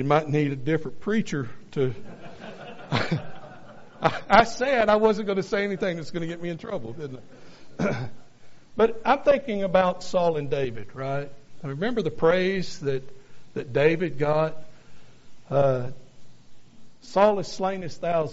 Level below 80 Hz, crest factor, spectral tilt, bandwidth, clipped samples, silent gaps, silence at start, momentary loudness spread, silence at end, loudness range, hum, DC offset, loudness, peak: -52 dBFS; 24 dB; -5 dB/octave; 8 kHz; under 0.1%; none; 0 s; 18 LU; 0 s; 6 LU; none; under 0.1%; -25 LUFS; -2 dBFS